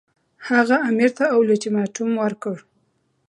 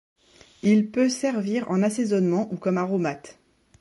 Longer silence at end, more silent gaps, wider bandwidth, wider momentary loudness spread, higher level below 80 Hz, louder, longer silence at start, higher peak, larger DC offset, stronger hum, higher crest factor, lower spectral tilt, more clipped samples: first, 0.7 s vs 0.5 s; neither; about the same, 11 kHz vs 11.5 kHz; first, 13 LU vs 6 LU; about the same, -72 dBFS vs -68 dBFS; first, -20 LUFS vs -24 LUFS; second, 0.4 s vs 0.65 s; first, -4 dBFS vs -10 dBFS; neither; neither; about the same, 18 dB vs 16 dB; about the same, -5.5 dB/octave vs -6 dB/octave; neither